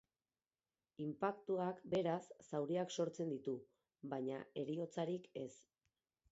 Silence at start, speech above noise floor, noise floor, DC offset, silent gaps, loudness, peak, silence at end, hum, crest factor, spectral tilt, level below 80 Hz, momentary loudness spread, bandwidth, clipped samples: 1 s; over 47 dB; under -90 dBFS; under 0.1%; none; -44 LUFS; -24 dBFS; 0.7 s; none; 20 dB; -6 dB/octave; -84 dBFS; 9 LU; 8 kHz; under 0.1%